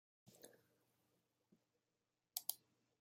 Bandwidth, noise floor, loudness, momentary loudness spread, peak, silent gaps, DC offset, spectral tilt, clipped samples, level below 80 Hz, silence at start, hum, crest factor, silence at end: 16 kHz; under -90 dBFS; -47 LUFS; 19 LU; -20 dBFS; none; under 0.1%; 0 dB/octave; under 0.1%; under -90 dBFS; 0.25 s; none; 38 dB; 0.45 s